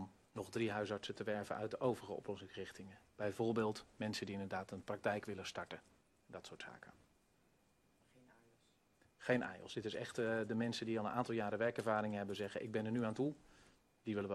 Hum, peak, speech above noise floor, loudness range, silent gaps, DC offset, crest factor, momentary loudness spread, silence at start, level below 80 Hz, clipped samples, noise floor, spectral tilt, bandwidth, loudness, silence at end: none; -22 dBFS; 34 dB; 12 LU; none; under 0.1%; 20 dB; 14 LU; 0 s; -78 dBFS; under 0.1%; -75 dBFS; -5.5 dB/octave; 13 kHz; -42 LUFS; 0 s